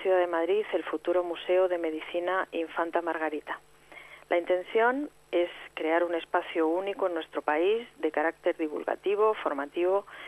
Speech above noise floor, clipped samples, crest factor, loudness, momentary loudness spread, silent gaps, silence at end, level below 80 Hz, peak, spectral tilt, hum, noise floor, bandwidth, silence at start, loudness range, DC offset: 21 dB; under 0.1%; 18 dB; -29 LUFS; 7 LU; none; 0 s; -70 dBFS; -12 dBFS; -4.5 dB/octave; none; -50 dBFS; 12.5 kHz; 0 s; 2 LU; under 0.1%